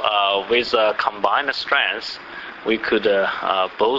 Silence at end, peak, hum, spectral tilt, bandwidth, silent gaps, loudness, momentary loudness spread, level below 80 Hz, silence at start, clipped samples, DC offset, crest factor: 0 s; -2 dBFS; none; -4 dB/octave; 7.8 kHz; none; -19 LUFS; 10 LU; -56 dBFS; 0 s; under 0.1%; under 0.1%; 18 dB